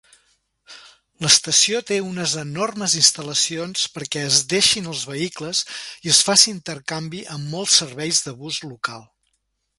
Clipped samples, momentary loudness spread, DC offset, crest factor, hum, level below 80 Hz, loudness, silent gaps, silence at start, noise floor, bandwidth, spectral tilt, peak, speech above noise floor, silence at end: under 0.1%; 15 LU; under 0.1%; 22 dB; none; -62 dBFS; -18 LUFS; none; 0.7 s; -72 dBFS; 16 kHz; -1.5 dB/octave; 0 dBFS; 51 dB; 0.75 s